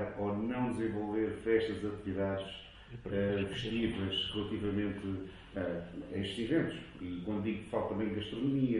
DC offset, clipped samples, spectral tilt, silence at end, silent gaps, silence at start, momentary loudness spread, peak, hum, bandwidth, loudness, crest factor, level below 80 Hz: under 0.1%; under 0.1%; -7 dB/octave; 0 s; none; 0 s; 9 LU; -18 dBFS; none; 11 kHz; -36 LUFS; 18 dB; -56 dBFS